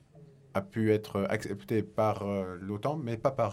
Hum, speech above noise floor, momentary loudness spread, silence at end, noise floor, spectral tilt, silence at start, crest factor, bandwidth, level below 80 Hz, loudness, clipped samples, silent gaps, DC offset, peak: none; 25 dB; 7 LU; 0 s; -56 dBFS; -7.5 dB/octave; 0.15 s; 18 dB; 16 kHz; -64 dBFS; -32 LUFS; under 0.1%; none; under 0.1%; -14 dBFS